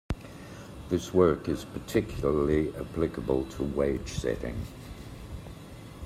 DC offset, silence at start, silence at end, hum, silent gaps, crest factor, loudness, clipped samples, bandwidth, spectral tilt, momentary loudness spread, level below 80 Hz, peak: under 0.1%; 0.1 s; 0 s; none; none; 22 dB; -29 LUFS; under 0.1%; 15.5 kHz; -6.5 dB/octave; 19 LU; -44 dBFS; -8 dBFS